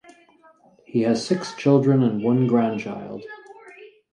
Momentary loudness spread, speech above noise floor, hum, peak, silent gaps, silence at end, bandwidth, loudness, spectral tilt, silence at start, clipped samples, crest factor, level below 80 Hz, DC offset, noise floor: 18 LU; 34 dB; none; -6 dBFS; none; 0.3 s; 10.5 kHz; -21 LUFS; -7.5 dB/octave; 0.95 s; under 0.1%; 18 dB; -66 dBFS; under 0.1%; -55 dBFS